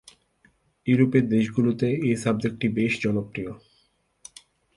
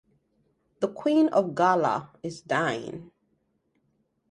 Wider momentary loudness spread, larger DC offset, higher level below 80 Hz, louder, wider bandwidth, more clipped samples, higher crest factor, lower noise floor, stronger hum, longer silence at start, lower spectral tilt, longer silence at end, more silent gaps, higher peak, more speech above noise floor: about the same, 17 LU vs 16 LU; neither; first, -58 dBFS vs -70 dBFS; about the same, -24 LUFS vs -25 LUFS; about the same, 11.5 kHz vs 10.5 kHz; neither; about the same, 18 dB vs 20 dB; second, -67 dBFS vs -72 dBFS; neither; about the same, 0.85 s vs 0.8 s; about the same, -7 dB/octave vs -6 dB/octave; about the same, 1.2 s vs 1.25 s; neither; about the same, -6 dBFS vs -8 dBFS; about the same, 44 dB vs 47 dB